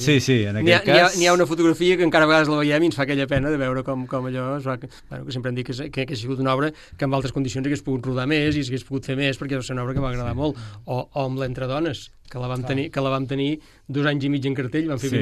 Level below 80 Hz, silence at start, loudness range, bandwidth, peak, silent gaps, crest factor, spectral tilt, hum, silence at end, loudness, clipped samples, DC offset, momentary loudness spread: -44 dBFS; 0 s; 9 LU; 13 kHz; -2 dBFS; none; 20 dB; -5.5 dB/octave; none; 0 s; -22 LUFS; under 0.1%; under 0.1%; 12 LU